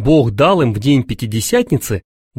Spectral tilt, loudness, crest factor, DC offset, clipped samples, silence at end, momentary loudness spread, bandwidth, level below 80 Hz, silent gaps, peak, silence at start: -6 dB/octave; -15 LUFS; 14 dB; under 0.1%; under 0.1%; 0.4 s; 9 LU; 16.5 kHz; -36 dBFS; none; -2 dBFS; 0 s